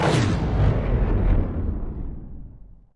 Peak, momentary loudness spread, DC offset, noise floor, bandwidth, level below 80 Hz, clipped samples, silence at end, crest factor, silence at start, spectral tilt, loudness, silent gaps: -8 dBFS; 17 LU; under 0.1%; -43 dBFS; 11 kHz; -26 dBFS; under 0.1%; 0.2 s; 14 dB; 0 s; -7 dB/octave; -24 LUFS; none